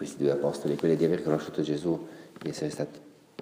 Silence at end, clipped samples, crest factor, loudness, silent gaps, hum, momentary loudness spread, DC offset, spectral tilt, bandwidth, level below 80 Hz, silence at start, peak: 0 s; under 0.1%; 18 dB; -29 LUFS; none; none; 12 LU; under 0.1%; -6.5 dB/octave; 15.5 kHz; -66 dBFS; 0 s; -10 dBFS